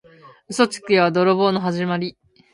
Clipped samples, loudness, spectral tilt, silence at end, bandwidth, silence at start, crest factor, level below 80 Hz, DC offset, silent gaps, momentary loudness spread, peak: under 0.1%; -19 LUFS; -5.5 dB/octave; 0.45 s; 11.5 kHz; 0.25 s; 20 dB; -66 dBFS; under 0.1%; none; 10 LU; -2 dBFS